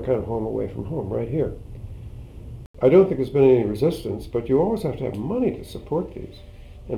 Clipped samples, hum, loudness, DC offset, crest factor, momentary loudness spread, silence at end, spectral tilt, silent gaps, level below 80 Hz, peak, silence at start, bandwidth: under 0.1%; none; -22 LUFS; under 0.1%; 18 dB; 23 LU; 0 s; -8.5 dB/octave; 2.66-2.74 s; -42 dBFS; -4 dBFS; 0 s; 13 kHz